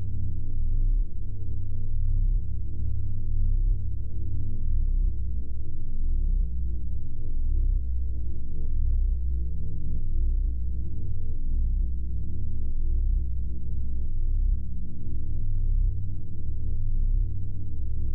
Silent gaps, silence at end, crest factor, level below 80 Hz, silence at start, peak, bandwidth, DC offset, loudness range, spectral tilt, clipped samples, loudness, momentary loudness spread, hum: none; 0 s; 8 dB; -26 dBFS; 0 s; -14 dBFS; 0.6 kHz; under 0.1%; 1 LU; -13 dB/octave; under 0.1%; -32 LUFS; 6 LU; none